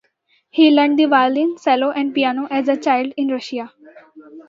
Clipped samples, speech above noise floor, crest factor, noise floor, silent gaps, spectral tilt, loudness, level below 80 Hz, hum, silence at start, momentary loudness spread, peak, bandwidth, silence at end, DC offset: under 0.1%; 46 dB; 16 dB; -63 dBFS; none; -4.5 dB/octave; -17 LUFS; -74 dBFS; none; 0.55 s; 12 LU; -2 dBFS; 7.4 kHz; 0.05 s; under 0.1%